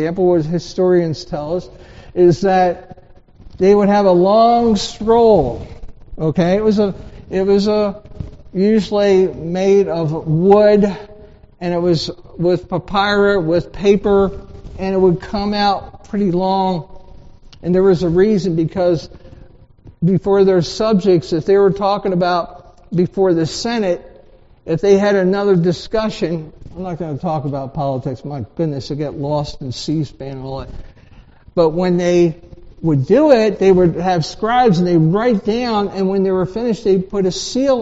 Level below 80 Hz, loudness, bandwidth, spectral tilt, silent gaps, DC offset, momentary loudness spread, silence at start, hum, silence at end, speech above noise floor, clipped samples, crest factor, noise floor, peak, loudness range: -40 dBFS; -16 LUFS; 8 kHz; -6 dB/octave; none; under 0.1%; 13 LU; 0 s; none; 0 s; 30 dB; under 0.1%; 16 dB; -45 dBFS; 0 dBFS; 7 LU